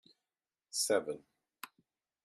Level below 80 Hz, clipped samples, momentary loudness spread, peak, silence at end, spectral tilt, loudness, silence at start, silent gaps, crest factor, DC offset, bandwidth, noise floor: -88 dBFS; under 0.1%; 20 LU; -18 dBFS; 0.6 s; -1.5 dB/octave; -35 LUFS; 0.75 s; none; 22 dB; under 0.1%; 14 kHz; under -90 dBFS